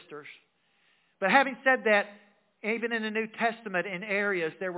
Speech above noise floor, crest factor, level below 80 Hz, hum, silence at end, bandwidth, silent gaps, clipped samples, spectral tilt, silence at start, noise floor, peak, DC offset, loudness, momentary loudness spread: 41 dB; 22 dB; under -90 dBFS; none; 0 s; 4 kHz; none; under 0.1%; -2.5 dB/octave; 0.1 s; -69 dBFS; -8 dBFS; under 0.1%; -27 LUFS; 12 LU